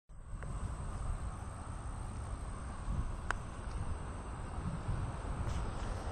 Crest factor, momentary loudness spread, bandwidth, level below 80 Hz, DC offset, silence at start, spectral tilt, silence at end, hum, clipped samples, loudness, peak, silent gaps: 24 dB; 5 LU; 10.5 kHz; -42 dBFS; under 0.1%; 0.1 s; -6 dB/octave; 0 s; none; under 0.1%; -43 LUFS; -16 dBFS; none